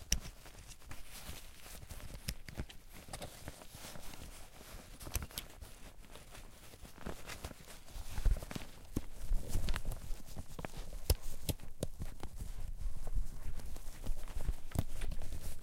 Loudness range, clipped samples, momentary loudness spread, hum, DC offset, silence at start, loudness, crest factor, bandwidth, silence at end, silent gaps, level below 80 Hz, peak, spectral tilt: 6 LU; under 0.1%; 15 LU; none; under 0.1%; 0 s; -46 LUFS; 26 dB; 16.5 kHz; 0 s; none; -42 dBFS; -12 dBFS; -4 dB/octave